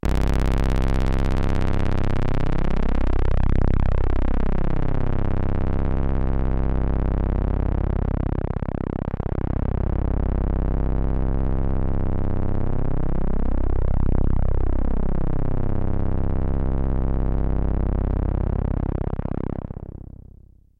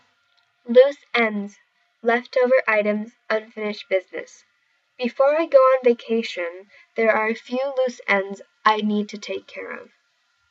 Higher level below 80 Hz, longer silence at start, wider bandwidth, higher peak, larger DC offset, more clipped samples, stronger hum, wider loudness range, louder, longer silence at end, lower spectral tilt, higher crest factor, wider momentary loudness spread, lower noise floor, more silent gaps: first, -22 dBFS vs -86 dBFS; second, 0.05 s vs 0.65 s; second, 5.2 kHz vs 7.6 kHz; second, -6 dBFS vs -2 dBFS; neither; neither; first, 50 Hz at -30 dBFS vs none; about the same, 2 LU vs 3 LU; second, -25 LUFS vs -21 LUFS; about the same, 0.75 s vs 0.65 s; first, -9 dB/octave vs -5 dB/octave; second, 14 dB vs 20 dB; second, 4 LU vs 16 LU; second, -48 dBFS vs -67 dBFS; neither